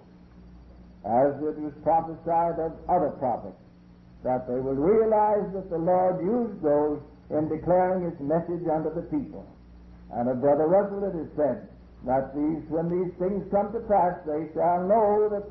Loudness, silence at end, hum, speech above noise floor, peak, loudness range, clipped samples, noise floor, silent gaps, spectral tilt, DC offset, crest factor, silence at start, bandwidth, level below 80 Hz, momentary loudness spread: -26 LUFS; 0 s; 60 Hz at -55 dBFS; 26 dB; -12 dBFS; 3 LU; under 0.1%; -51 dBFS; none; -12.5 dB/octave; under 0.1%; 14 dB; 0.35 s; 4.9 kHz; -52 dBFS; 10 LU